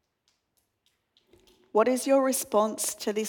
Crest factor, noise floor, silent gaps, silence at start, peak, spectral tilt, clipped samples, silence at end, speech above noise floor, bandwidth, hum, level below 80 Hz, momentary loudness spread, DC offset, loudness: 18 dB; -76 dBFS; none; 1.75 s; -10 dBFS; -3 dB/octave; under 0.1%; 0 s; 50 dB; 19 kHz; none; -76 dBFS; 5 LU; under 0.1%; -26 LUFS